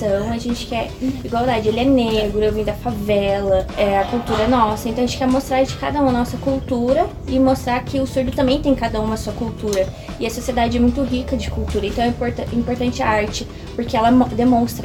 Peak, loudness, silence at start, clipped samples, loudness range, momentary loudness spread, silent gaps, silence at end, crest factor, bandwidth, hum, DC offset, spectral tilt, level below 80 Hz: -2 dBFS; -19 LUFS; 0 s; under 0.1%; 2 LU; 8 LU; none; 0 s; 16 dB; 17 kHz; none; under 0.1%; -6 dB/octave; -32 dBFS